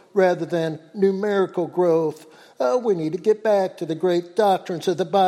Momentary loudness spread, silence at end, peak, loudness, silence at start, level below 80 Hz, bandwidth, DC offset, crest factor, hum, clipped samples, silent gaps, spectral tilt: 6 LU; 0 s; -6 dBFS; -22 LUFS; 0.15 s; -74 dBFS; 13.5 kHz; under 0.1%; 14 dB; none; under 0.1%; none; -6.5 dB/octave